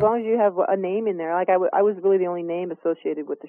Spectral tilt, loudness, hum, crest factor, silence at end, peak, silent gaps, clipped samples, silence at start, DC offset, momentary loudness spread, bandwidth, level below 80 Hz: -10.5 dB/octave; -22 LUFS; none; 14 dB; 0 s; -8 dBFS; none; under 0.1%; 0 s; under 0.1%; 7 LU; 3.4 kHz; -68 dBFS